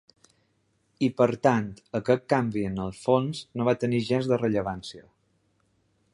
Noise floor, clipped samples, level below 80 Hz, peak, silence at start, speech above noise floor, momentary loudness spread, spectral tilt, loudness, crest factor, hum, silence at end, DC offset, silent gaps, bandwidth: -70 dBFS; under 0.1%; -58 dBFS; -6 dBFS; 1 s; 45 dB; 9 LU; -7 dB/octave; -26 LUFS; 22 dB; none; 1.15 s; under 0.1%; none; 11 kHz